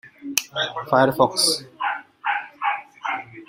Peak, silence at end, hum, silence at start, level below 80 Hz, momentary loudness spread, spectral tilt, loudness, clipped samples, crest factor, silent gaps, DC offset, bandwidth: 0 dBFS; 0.05 s; none; 0.05 s; -62 dBFS; 11 LU; -2.5 dB/octave; -22 LUFS; under 0.1%; 24 dB; none; under 0.1%; 16 kHz